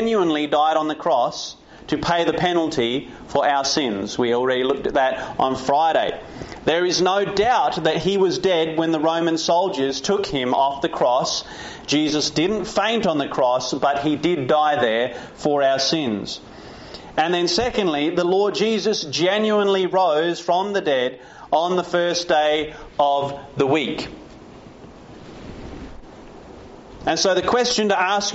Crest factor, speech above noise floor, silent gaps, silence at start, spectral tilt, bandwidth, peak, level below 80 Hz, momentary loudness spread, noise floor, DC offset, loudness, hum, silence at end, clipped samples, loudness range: 16 dB; 22 dB; none; 0 s; -2.5 dB/octave; 8 kHz; -6 dBFS; -50 dBFS; 11 LU; -42 dBFS; under 0.1%; -20 LUFS; none; 0 s; under 0.1%; 4 LU